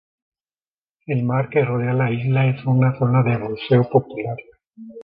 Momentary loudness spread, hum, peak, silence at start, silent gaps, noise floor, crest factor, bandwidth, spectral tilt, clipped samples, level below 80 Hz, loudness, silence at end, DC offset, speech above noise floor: 10 LU; none; -2 dBFS; 1.1 s; none; under -90 dBFS; 18 dB; 4.9 kHz; -11.5 dB/octave; under 0.1%; -56 dBFS; -20 LUFS; 0 s; under 0.1%; over 71 dB